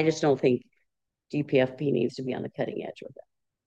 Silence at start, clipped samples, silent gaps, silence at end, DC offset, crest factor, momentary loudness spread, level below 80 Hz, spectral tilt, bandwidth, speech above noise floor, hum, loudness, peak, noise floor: 0 s; under 0.1%; none; 0.6 s; under 0.1%; 18 dB; 14 LU; -76 dBFS; -6.5 dB/octave; 8.6 kHz; 52 dB; none; -28 LUFS; -10 dBFS; -79 dBFS